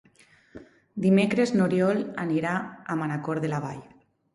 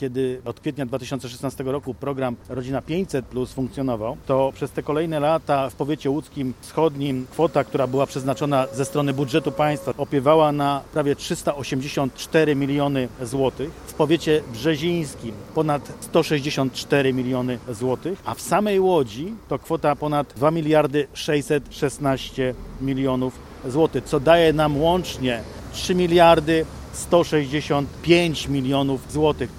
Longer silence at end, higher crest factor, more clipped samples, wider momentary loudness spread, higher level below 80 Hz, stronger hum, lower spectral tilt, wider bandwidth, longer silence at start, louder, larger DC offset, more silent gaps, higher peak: first, 0.5 s vs 0 s; about the same, 16 dB vs 20 dB; neither; about the same, 11 LU vs 10 LU; second, -66 dBFS vs -46 dBFS; neither; about the same, -7 dB/octave vs -6 dB/octave; second, 11.5 kHz vs 16.5 kHz; first, 0.55 s vs 0 s; second, -26 LUFS vs -22 LUFS; neither; neither; second, -10 dBFS vs -2 dBFS